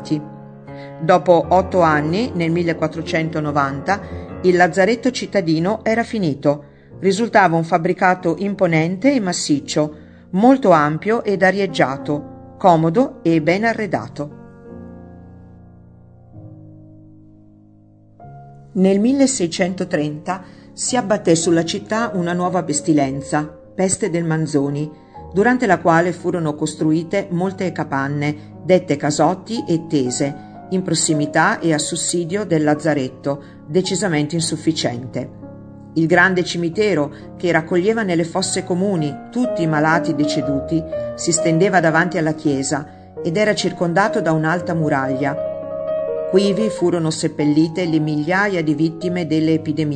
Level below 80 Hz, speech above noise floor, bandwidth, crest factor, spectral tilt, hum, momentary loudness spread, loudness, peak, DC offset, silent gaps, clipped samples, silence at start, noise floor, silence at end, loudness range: -52 dBFS; 30 dB; 9.4 kHz; 18 dB; -5 dB/octave; none; 11 LU; -18 LUFS; 0 dBFS; under 0.1%; none; under 0.1%; 0 s; -48 dBFS; 0 s; 3 LU